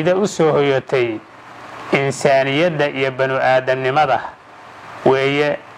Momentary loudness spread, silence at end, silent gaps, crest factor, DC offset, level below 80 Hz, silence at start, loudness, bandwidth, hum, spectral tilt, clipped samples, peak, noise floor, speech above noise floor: 18 LU; 0 s; none; 16 dB; under 0.1%; -58 dBFS; 0 s; -17 LUFS; 12.5 kHz; none; -5.5 dB/octave; under 0.1%; 0 dBFS; -39 dBFS; 23 dB